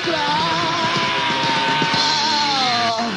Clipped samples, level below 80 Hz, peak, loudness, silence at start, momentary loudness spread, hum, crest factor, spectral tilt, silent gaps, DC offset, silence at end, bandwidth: under 0.1%; -56 dBFS; -4 dBFS; -17 LUFS; 0 s; 3 LU; none; 14 dB; -3 dB/octave; none; under 0.1%; 0 s; 10.5 kHz